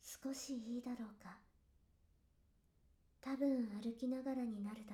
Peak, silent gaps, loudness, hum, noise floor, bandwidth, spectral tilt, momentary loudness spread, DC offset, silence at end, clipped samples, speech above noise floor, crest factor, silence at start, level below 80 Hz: -30 dBFS; none; -44 LUFS; none; -75 dBFS; 16.5 kHz; -5 dB/octave; 15 LU; under 0.1%; 0 s; under 0.1%; 31 dB; 16 dB; 0.05 s; -76 dBFS